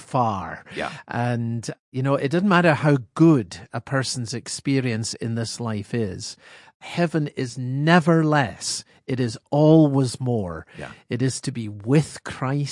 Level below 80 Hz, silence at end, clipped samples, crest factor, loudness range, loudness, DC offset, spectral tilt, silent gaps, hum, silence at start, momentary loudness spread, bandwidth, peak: -62 dBFS; 0 s; under 0.1%; 20 dB; 6 LU; -22 LUFS; under 0.1%; -6 dB/octave; 1.79-1.92 s, 6.74-6.80 s; none; 0 s; 14 LU; 11.5 kHz; -2 dBFS